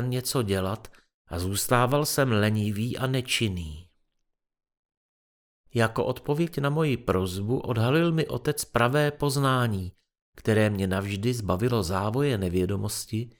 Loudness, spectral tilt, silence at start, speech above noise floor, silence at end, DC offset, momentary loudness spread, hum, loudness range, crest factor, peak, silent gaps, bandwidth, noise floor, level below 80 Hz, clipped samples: -26 LUFS; -5.5 dB/octave; 0 s; 52 dB; 0.1 s; under 0.1%; 8 LU; none; 6 LU; 18 dB; -8 dBFS; 1.14-1.25 s, 4.79-4.89 s, 4.97-5.64 s, 10.21-10.33 s; over 20 kHz; -77 dBFS; -50 dBFS; under 0.1%